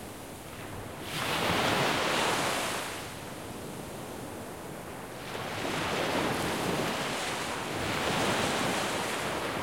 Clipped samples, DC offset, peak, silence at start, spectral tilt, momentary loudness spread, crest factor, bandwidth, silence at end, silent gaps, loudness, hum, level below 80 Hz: under 0.1%; 0.1%; -14 dBFS; 0 s; -3.5 dB/octave; 14 LU; 18 dB; 16.5 kHz; 0 s; none; -31 LUFS; none; -56 dBFS